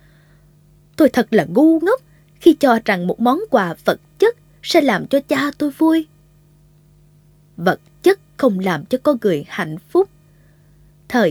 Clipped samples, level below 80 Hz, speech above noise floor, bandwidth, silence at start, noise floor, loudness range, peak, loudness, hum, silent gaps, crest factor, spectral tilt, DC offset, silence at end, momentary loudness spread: under 0.1%; -56 dBFS; 35 dB; 19 kHz; 1 s; -51 dBFS; 5 LU; 0 dBFS; -17 LUFS; 50 Hz at -50 dBFS; none; 18 dB; -6 dB/octave; under 0.1%; 0 s; 8 LU